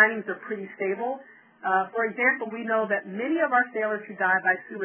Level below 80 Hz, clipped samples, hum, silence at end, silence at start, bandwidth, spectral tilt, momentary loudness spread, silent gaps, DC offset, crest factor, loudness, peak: -74 dBFS; under 0.1%; none; 0 s; 0 s; 3.5 kHz; -8.5 dB/octave; 10 LU; none; under 0.1%; 20 dB; -26 LUFS; -6 dBFS